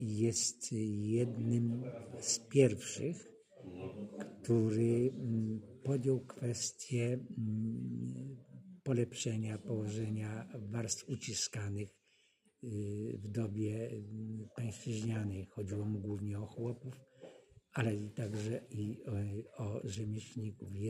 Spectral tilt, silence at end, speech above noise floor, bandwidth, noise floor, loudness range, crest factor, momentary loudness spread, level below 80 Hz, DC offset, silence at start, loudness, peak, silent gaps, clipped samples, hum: -5.5 dB/octave; 0 s; 36 dB; 14.5 kHz; -73 dBFS; 6 LU; 24 dB; 13 LU; -74 dBFS; under 0.1%; 0 s; -38 LUFS; -14 dBFS; none; under 0.1%; none